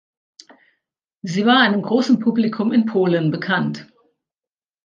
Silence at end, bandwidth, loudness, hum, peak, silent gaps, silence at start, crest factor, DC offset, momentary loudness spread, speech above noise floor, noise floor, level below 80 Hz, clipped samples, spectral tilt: 1 s; 7.4 kHz; -18 LUFS; none; -2 dBFS; none; 1.25 s; 18 dB; under 0.1%; 12 LU; over 73 dB; under -90 dBFS; -70 dBFS; under 0.1%; -6 dB/octave